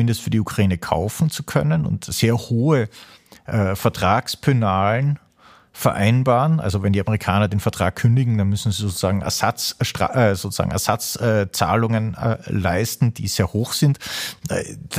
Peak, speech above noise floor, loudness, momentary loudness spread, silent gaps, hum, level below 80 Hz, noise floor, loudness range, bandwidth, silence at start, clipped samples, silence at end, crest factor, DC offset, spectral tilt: -2 dBFS; 32 dB; -20 LUFS; 5 LU; none; none; -44 dBFS; -51 dBFS; 2 LU; 15.5 kHz; 0 s; under 0.1%; 0 s; 18 dB; under 0.1%; -5.5 dB/octave